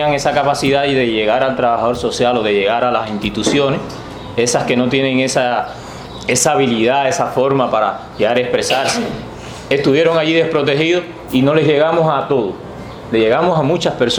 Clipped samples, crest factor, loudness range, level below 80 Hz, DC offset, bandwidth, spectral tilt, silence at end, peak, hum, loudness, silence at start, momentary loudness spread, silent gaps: under 0.1%; 14 dB; 2 LU; -44 dBFS; under 0.1%; 16.5 kHz; -4.5 dB/octave; 0 s; 0 dBFS; none; -15 LUFS; 0 s; 11 LU; none